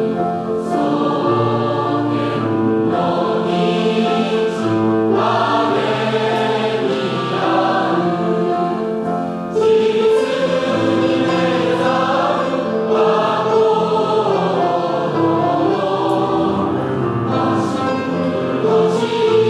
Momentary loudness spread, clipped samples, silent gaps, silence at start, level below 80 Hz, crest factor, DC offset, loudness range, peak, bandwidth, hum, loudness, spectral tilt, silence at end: 4 LU; under 0.1%; none; 0 s; -56 dBFS; 12 dB; under 0.1%; 2 LU; -4 dBFS; 11 kHz; none; -17 LUFS; -6.5 dB/octave; 0 s